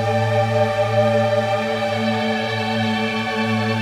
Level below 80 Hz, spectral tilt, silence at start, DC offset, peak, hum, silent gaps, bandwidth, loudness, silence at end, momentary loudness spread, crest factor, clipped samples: -52 dBFS; -6 dB/octave; 0 s; under 0.1%; -6 dBFS; none; none; 14 kHz; -19 LUFS; 0 s; 4 LU; 14 dB; under 0.1%